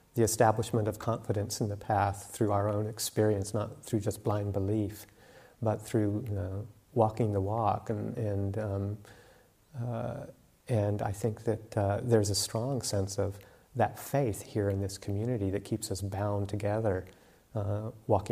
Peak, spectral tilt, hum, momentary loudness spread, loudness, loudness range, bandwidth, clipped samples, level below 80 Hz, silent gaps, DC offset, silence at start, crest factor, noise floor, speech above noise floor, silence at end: -10 dBFS; -6 dB/octave; none; 9 LU; -32 LUFS; 4 LU; 15.5 kHz; under 0.1%; -60 dBFS; none; under 0.1%; 0.15 s; 22 dB; -61 dBFS; 30 dB; 0 s